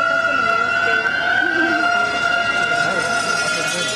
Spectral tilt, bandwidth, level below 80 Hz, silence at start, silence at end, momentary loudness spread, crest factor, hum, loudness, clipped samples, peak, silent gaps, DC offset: -2 dB/octave; 13.5 kHz; -52 dBFS; 0 s; 0 s; 2 LU; 12 dB; none; -17 LUFS; under 0.1%; -6 dBFS; none; under 0.1%